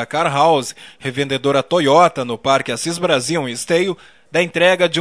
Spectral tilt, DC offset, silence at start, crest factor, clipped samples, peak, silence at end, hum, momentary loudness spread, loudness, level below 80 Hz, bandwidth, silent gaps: -4 dB/octave; 0.2%; 0 s; 16 dB; under 0.1%; 0 dBFS; 0 s; none; 9 LU; -16 LUFS; -60 dBFS; 11 kHz; none